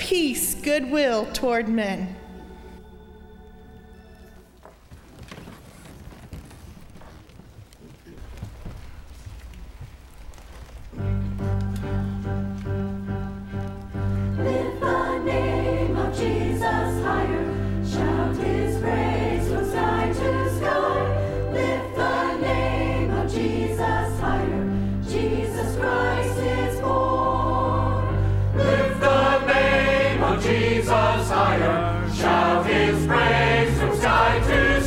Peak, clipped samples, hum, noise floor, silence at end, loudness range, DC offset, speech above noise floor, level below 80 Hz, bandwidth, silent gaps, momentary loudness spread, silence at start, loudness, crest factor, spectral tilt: -4 dBFS; under 0.1%; none; -49 dBFS; 0 s; 23 LU; under 0.1%; 26 dB; -34 dBFS; 15.5 kHz; none; 22 LU; 0 s; -23 LUFS; 20 dB; -6 dB/octave